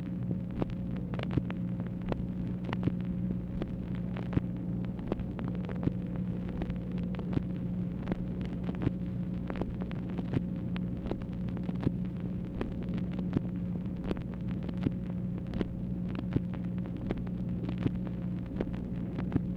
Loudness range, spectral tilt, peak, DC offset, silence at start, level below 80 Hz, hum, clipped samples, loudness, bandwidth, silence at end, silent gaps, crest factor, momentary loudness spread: 0 LU; -10 dB/octave; -14 dBFS; under 0.1%; 0 s; -46 dBFS; 60 Hz at -40 dBFS; under 0.1%; -35 LUFS; 5.4 kHz; 0 s; none; 20 dB; 3 LU